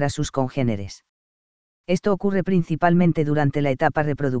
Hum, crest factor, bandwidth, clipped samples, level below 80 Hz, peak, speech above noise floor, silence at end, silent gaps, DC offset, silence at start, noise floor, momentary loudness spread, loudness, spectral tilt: none; 20 dB; 8 kHz; under 0.1%; -46 dBFS; -2 dBFS; over 69 dB; 0 s; 1.09-1.84 s; 2%; 0 s; under -90 dBFS; 7 LU; -22 LUFS; -7 dB/octave